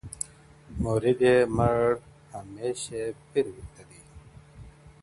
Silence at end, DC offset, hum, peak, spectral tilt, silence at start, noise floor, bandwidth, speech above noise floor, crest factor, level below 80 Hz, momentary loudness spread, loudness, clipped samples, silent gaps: 0.15 s; under 0.1%; none; -8 dBFS; -6 dB/octave; 0.05 s; -51 dBFS; 11.5 kHz; 25 dB; 20 dB; -48 dBFS; 22 LU; -27 LUFS; under 0.1%; none